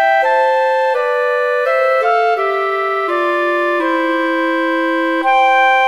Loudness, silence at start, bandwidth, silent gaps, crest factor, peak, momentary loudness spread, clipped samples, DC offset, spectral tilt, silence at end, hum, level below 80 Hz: -14 LUFS; 0 s; 14 kHz; none; 12 dB; -2 dBFS; 4 LU; under 0.1%; 0.2%; -2 dB/octave; 0 s; none; -70 dBFS